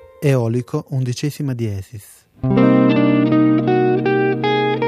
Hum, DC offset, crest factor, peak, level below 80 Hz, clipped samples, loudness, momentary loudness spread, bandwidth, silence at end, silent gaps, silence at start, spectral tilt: none; under 0.1%; 14 dB; -2 dBFS; -50 dBFS; under 0.1%; -17 LUFS; 11 LU; 14.5 kHz; 0 s; none; 0.2 s; -7.5 dB/octave